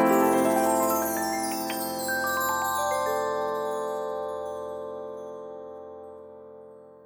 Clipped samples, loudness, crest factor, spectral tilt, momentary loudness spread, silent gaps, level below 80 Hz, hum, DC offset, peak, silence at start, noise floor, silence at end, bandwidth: under 0.1%; -27 LUFS; 18 dB; -3.5 dB/octave; 20 LU; none; -66 dBFS; none; under 0.1%; -10 dBFS; 0 s; -48 dBFS; 0 s; over 20 kHz